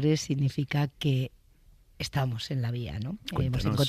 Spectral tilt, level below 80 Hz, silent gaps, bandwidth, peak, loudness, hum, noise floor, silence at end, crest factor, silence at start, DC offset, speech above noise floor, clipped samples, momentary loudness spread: -6 dB/octave; -48 dBFS; none; 14.5 kHz; -12 dBFS; -30 LUFS; none; -58 dBFS; 0 s; 18 dB; 0 s; under 0.1%; 30 dB; under 0.1%; 8 LU